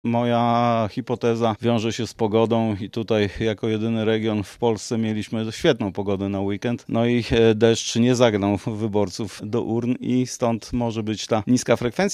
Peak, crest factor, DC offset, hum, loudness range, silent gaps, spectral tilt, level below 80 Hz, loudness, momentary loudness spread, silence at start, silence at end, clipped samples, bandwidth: -2 dBFS; 20 dB; under 0.1%; none; 3 LU; none; -5.5 dB/octave; -48 dBFS; -22 LUFS; 7 LU; 0.05 s; 0 s; under 0.1%; 12.5 kHz